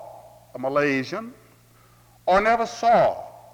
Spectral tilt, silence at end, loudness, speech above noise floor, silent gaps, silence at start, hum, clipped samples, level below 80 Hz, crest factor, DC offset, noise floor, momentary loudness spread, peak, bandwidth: -5 dB/octave; 0.2 s; -22 LUFS; 33 dB; none; 0 s; none; under 0.1%; -52 dBFS; 18 dB; under 0.1%; -55 dBFS; 21 LU; -6 dBFS; 18 kHz